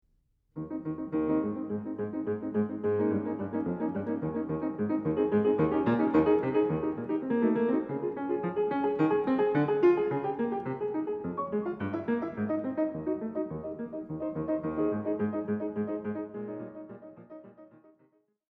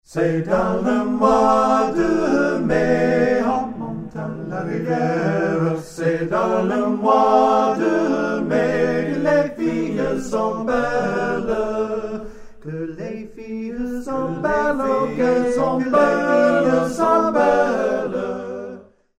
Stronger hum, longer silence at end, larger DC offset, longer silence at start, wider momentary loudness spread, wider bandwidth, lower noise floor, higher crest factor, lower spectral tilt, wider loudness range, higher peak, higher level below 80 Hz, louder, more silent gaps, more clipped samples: neither; first, 0.9 s vs 0.4 s; neither; first, 0.55 s vs 0.1 s; about the same, 12 LU vs 13 LU; second, 4.7 kHz vs 13 kHz; first, -71 dBFS vs -39 dBFS; about the same, 18 dB vs 16 dB; first, -10.5 dB/octave vs -7 dB/octave; about the same, 6 LU vs 7 LU; second, -14 dBFS vs -2 dBFS; second, -62 dBFS vs -46 dBFS; second, -30 LUFS vs -19 LUFS; neither; neither